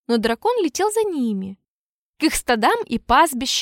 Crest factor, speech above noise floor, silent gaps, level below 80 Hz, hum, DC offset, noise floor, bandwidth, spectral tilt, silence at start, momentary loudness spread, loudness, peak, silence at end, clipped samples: 16 dB; over 71 dB; 1.68-2.13 s; -44 dBFS; none; under 0.1%; under -90 dBFS; 17 kHz; -3 dB/octave; 0.1 s; 8 LU; -20 LUFS; -4 dBFS; 0 s; under 0.1%